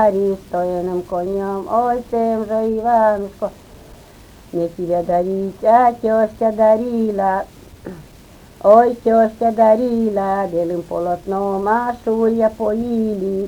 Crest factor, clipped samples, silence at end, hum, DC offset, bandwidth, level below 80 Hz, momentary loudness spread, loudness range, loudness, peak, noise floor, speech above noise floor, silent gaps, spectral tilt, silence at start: 16 dB; under 0.1%; 0 s; none; under 0.1%; 19.5 kHz; -46 dBFS; 9 LU; 4 LU; -17 LUFS; 0 dBFS; -43 dBFS; 26 dB; none; -8 dB/octave; 0 s